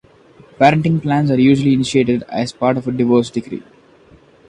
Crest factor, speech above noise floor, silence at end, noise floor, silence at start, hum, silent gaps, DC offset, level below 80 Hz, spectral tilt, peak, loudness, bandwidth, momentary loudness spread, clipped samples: 16 dB; 33 dB; 0.9 s; -47 dBFS; 0.6 s; none; none; under 0.1%; -50 dBFS; -7 dB/octave; 0 dBFS; -15 LUFS; 10.5 kHz; 11 LU; under 0.1%